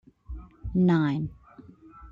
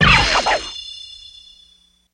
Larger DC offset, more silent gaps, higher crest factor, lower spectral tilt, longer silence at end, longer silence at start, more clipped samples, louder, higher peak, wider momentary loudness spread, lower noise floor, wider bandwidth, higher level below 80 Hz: neither; neither; about the same, 16 dB vs 18 dB; first, -9.5 dB/octave vs -3 dB/octave; second, 0 s vs 1 s; first, 0.3 s vs 0 s; neither; second, -26 LUFS vs -16 LUFS; second, -12 dBFS vs 0 dBFS; second, 22 LU vs 25 LU; second, -51 dBFS vs -55 dBFS; second, 5.4 kHz vs 10.5 kHz; second, -46 dBFS vs -32 dBFS